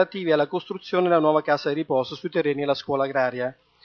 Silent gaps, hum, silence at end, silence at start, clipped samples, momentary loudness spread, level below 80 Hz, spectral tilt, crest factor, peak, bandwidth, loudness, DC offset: none; none; 0.3 s; 0 s; under 0.1%; 7 LU; -70 dBFS; -7 dB/octave; 18 dB; -6 dBFS; 6.8 kHz; -24 LUFS; under 0.1%